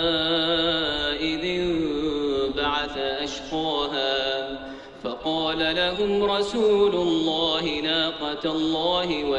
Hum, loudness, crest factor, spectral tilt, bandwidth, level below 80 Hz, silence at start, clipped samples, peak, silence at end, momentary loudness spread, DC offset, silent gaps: none; -24 LUFS; 14 dB; -4.5 dB/octave; 10 kHz; -48 dBFS; 0 s; under 0.1%; -10 dBFS; 0 s; 7 LU; under 0.1%; none